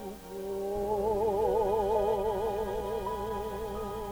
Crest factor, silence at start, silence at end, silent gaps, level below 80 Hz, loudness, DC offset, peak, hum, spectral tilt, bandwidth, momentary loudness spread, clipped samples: 16 dB; 0 s; 0 s; none; -46 dBFS; -31 LUFS; under 0.1%; -16 dBFS; none; -6 dB/octave; over 20 kHz; 9 LU; under 0.1%